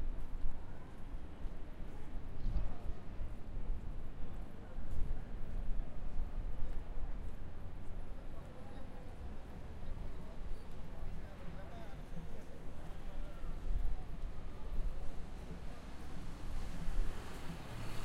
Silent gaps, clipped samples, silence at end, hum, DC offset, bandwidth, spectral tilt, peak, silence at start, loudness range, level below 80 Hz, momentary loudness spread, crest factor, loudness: none; under 0.1%; 0 s; none; under 0.1%; 5.2 kHz; -6.5 dB/octave; -22 dBFS; 0 s; 3 LU; -40 dBFS; 7 LU; 14 dB; -49 LUFS